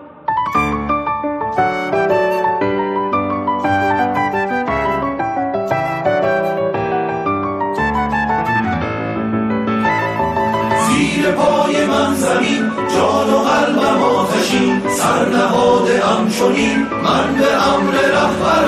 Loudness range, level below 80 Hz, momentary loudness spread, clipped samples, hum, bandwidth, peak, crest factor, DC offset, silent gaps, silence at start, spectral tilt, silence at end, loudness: 4 LU; -42 dBFS; 5 LU; under 0.1%; none; 15.5 kHz; -4 dBFS; 12 dB; under 0.1%; none; 0 s; -5 dB/octave; 0 s; -16 LUFS